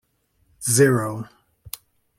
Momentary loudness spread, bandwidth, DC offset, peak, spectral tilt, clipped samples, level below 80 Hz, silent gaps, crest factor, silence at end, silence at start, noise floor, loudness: 21 LU; 16.5 kHz; under 0.1%; -4 dBFS; -4.5 dB/octave; under 0.1%; -60 dBFS; none; 20 dB; 0.5 s; 0.6 s; -66 dBFS; -20 LUFS